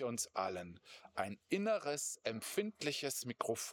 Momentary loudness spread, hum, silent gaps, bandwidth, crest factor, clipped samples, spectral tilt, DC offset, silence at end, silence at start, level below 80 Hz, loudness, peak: 10 LU; none; none; over 20 kHz; 20 dB; under 0.1%; -3 dB/octave; under 0.1%; 0 s; 0 s; -84 dBFS; -40 LUFS; -20 dBFS